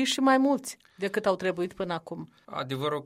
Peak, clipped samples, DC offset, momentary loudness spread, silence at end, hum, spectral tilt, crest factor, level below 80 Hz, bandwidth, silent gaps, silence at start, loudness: -10 dBFS; under 0.1%; under 0.1%; 17 LU; 0 s; none; -4.5 dB/octave; 18 dB; -68 dBFS; 16 kHz; none; 0 s; -28 LUFS